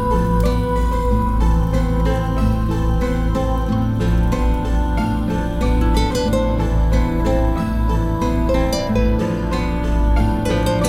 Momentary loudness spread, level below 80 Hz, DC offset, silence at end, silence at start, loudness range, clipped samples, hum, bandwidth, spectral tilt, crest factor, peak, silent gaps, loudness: 2 LU; -20 dBFS; under 0.1%; 0 s; 0 s; 1 LU; under 0.1%; none; 14 kHz; -7 dB/octave; 12 dB; -4 dBFS; none; -19 LUFS